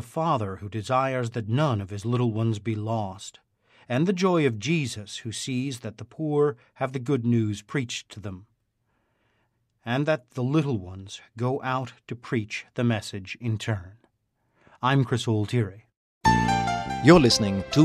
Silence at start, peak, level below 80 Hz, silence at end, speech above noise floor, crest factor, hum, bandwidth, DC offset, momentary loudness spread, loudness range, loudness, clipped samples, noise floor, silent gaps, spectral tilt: 0 s; -2 dBFS; -50 dBFS; 0 s; 48 dB; 24 dB; none; 13 kHz; under 0.1%; 13 LU; 5 LU; -26 LUFS; under 0.1%; -73 dBFS; 15.97-16.21 s; -6 dB/octave